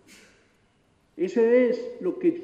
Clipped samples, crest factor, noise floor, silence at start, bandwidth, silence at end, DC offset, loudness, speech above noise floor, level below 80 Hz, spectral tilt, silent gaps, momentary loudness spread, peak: under 0.1%; 16 dB; -65 dBFS; 1.15 s; 8 kHz; 0 s; under 0.1%; -24 LUFS; 42 dB; -74 dBFS; -7 dB/octave; none; 11 LU; -10 dBFS